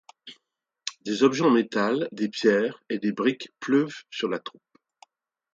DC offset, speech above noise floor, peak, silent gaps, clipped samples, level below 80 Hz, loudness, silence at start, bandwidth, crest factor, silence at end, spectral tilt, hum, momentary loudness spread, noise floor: under 0.1%; 51 dB; -6 dBFS; none; under 0.1%; -74 dBFS; -25 LUFS; 0.25 s; 7.8 kHz; 20 dB; 1.05 s; -5 dB/octave; none; 13 LU; -75 dBFS